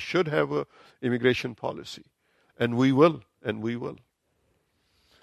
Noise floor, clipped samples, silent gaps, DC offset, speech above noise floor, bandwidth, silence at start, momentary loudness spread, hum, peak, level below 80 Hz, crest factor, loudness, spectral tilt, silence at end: -72 dBFS; under 0.1%; none; under 0.1%; 46 dB; 13.5 kHz; 0 s; 18 LU; none; -6 dBFS; -64 dBFS; 20 dB; -26 LUFS; -6.5 dB/octave; 1.3 s